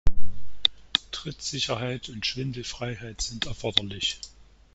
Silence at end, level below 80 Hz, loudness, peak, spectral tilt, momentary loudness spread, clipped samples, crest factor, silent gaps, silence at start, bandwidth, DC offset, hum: 0.5 s; -38 dBFS; -29 LUFS; -2 dBFS; -3 dB/octave; 11 LU; under 0.1%; 22 dB; none; 0.05 s; 8 kHz; under 0.1%; none